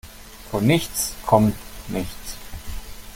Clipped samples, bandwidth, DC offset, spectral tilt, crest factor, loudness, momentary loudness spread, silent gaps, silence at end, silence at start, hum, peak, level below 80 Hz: under 0.1%; 17 kHz; under 0.1%; -5 dB/octave; 22 dB; -22 LUFS; 19 LU; none; 0 s; 0.05 s; none; -2 dBFS; -38 dBFS